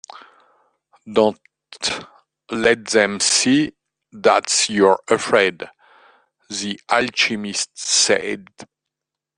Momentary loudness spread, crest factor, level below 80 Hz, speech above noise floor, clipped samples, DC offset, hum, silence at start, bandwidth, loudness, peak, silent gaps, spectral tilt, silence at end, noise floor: 13 LU; 20 dB; -60 dBFS; 66 dB; under 0.1%; under 0.1%; none; 0.15 s; 10.5 kHz; -18 LUFS; -2 dBFS; none; -2 dB/octave; 0.75 s; -85 dBFS